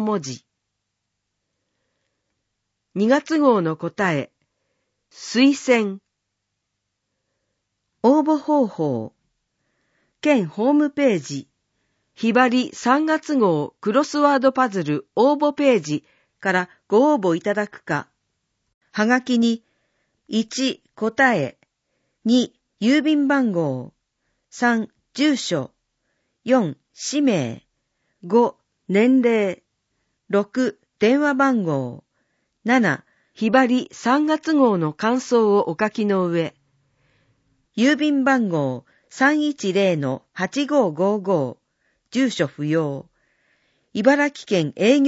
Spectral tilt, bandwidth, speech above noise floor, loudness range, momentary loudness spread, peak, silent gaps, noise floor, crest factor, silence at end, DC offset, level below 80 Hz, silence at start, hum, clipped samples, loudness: -5.5 dB/octave; 8 kHz; 59 dB; 4 LU; 11 LU; -2 dBFS; 18.74-18.81 s; -78 dBFS; 18 dB; 0 s; under 0.1%; -70 dBFS; 0 s; none; under 0.1%; -20 LUFS